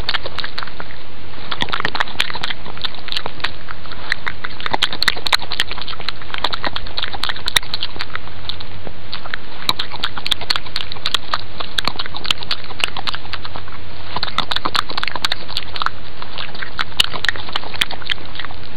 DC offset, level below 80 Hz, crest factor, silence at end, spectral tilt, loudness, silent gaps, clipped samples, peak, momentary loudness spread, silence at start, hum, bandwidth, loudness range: 20%; -40 dBFS; 26 dB; 0 s; -2 dB/octave; -22 LUFS; none; under 0.1%; 0 dBFS; 13 LU; 0 s; none; 16.5 kHz; 3 LU